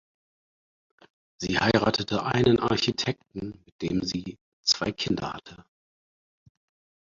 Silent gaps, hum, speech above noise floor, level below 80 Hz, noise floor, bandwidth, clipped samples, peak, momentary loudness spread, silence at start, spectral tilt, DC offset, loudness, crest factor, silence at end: 3.72-3.79 s, 4.41-4.63 s; none; over 64 dB; -54 dBFS; under -90 dBFS; 7.8 kHz; under 0.1%; -6 dBFS; 15 LU; 1.4 s; -4.5 dB/octave; under 0.1%; -26 LUFS; 24 dB; 1.4 s